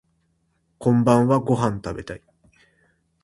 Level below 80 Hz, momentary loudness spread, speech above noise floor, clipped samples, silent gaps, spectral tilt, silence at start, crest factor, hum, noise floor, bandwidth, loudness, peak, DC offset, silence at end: -52 dBFS; 18 LU; 49 dB; under 0.1%; none; -8 dB/octave; 0.8 s; 22 dB; none; -68 dBFS; 11.5 kHz; -20 LUFS; -2 dBFS; under 0.1%; 1.05 s